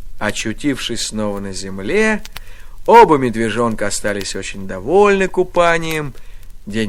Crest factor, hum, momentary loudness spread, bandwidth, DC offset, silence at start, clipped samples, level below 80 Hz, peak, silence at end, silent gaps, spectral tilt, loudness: 16 dB; none; 15 LU; 16.5 kHz; under 0.1%; 0 s; 0.3%; -34 dBFS; 0 dBFS; 0 s; none; -4.5 dB/octave; -16 LUFS